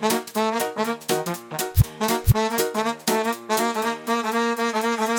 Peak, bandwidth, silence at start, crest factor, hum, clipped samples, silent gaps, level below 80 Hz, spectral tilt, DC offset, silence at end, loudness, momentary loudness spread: -4 dBFS; 19.5 kHz; 0 s; 18 dB; none; under 0.1%; none; -38 dBFS; -4.5 dB/octave; under 0.1%; 0 s; -23 LUFS; 5 LU